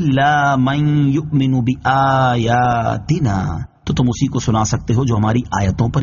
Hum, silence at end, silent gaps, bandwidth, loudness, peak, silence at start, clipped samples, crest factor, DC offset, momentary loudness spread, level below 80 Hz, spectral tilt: none; 0 s; none; 7.4 kHz; -16 LUFS; -4 dBFS; 0 s; under 0.1%; 12 dB; under 0.1%; 5 LU; -36 dBFS; -6 dB/octave